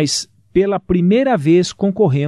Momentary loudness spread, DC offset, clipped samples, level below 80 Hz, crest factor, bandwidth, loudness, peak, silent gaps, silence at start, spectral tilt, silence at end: 5 LU; under 0.1%; under 0.1%; -42 dBFS; 12 dB; 12.5 kHz; -16 LUFS; -4 dBFS; none; 0 s; -6 dB/octave; 0 s